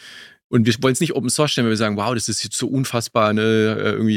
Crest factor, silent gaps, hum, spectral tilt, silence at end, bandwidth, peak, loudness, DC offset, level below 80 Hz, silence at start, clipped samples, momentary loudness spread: 16 dB; 0.44-0.50 s; none; -4.5 dB/octave; 0 s; 16 kHz; -2 dBFS; -19 LUFS; under 0.1%; -60 dBFS; 0 s; under 0.1%; 5 LU